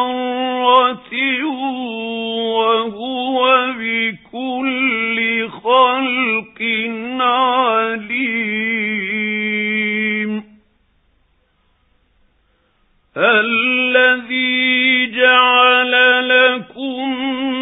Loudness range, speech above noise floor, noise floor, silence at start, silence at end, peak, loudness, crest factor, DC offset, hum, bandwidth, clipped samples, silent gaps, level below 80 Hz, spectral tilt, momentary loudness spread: 9 LU; 44 dB; -60 dBFS; 0 s; 0 s; 0 dBFS; -15 LUFS; 16 dB; under 0.1%; none; 4 kHz; under 0.1%; none; -62 dBFS; -7.5 dB/octave; 11 LU